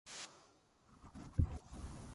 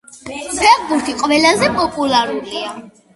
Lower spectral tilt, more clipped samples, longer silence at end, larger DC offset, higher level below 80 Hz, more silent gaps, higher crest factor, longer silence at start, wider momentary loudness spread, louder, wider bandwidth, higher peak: first, -5.5 dB/octave vs -2.5 dB/octave; neither; second, 0 s vs 0.25 s; neither; about the same, -48 dBFS vs -48 dBFS; neither; first, 24 dB vs 16 dB; about the same, 0.05 s vs 0.15 s; first, 22 LU vs 16 LU; second, -44 LUFS vs -15 LUFS; about the same, 11.5 kHz vs 11.5 kHz; second, -20 dBFS vs 0 dBFS